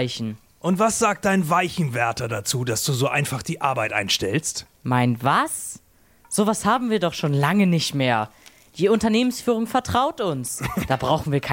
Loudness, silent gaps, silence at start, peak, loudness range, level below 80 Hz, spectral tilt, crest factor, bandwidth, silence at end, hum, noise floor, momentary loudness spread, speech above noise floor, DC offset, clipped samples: -22 LUFS; none; 0 s; -4 dBFS; 2 LU; -52 dBFS; -4.5 dB/octave; 18 dB; 17 kHz; 0 s; none; -45 dBFS; 8 LU; 23 dB; under 0.1%; under 0.1%